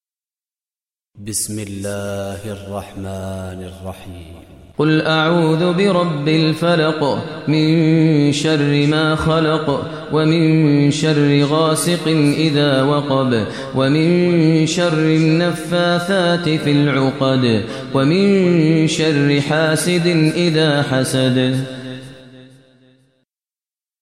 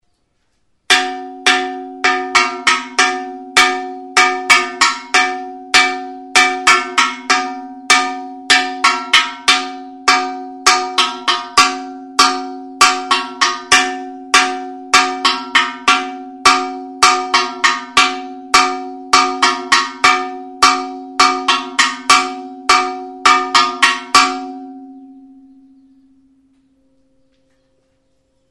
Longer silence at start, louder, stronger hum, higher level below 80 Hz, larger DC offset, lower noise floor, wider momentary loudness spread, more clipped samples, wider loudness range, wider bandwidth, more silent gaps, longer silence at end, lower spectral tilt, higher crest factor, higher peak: first, 1.15 s vs 0.9 s; about the same, -15 LUFS vs -13 LUFS; neither; about the same, -50 dBFS vs -52 dBFS; first, 0.2% vs under 0.1%; first, under -90 dBFS vs -65 dBFS; about the same, 14 LU vs 13 LU; second, under 0.1% vs 0.2%; first, 8 LU vs 2 LU; second, 14 kHz vs over 20 kHz; neither; second, 1.55 s vs 3.3 s; first, -6 dB/octave vs 0.5 dB/octave; about the same, 14 dB vs 16 dB; about the same, -2 dBFS vs 0 dBFS